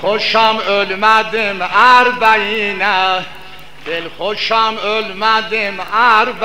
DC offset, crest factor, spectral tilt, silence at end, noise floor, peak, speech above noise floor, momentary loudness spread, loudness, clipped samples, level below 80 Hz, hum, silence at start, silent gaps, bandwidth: 2%; 14 dB; -3 dB/octave; 0 s; -36 dBFS; 0 dBFS; 23 dB; 12 LU; -13 LUFS; under 0.1%; -50 dBFS; none; 0 s; none; 16 kHz